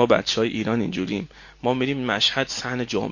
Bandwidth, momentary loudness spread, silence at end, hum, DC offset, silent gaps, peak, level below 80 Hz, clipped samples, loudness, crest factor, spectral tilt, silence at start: 7.4 kHz; 9 LU; 0 s; none; under 0.1%; none; -2 dBFS; -52 dBFS; under 0.1%; -23 LUFS; 20 dB; -4.5 dB/octave; 0 s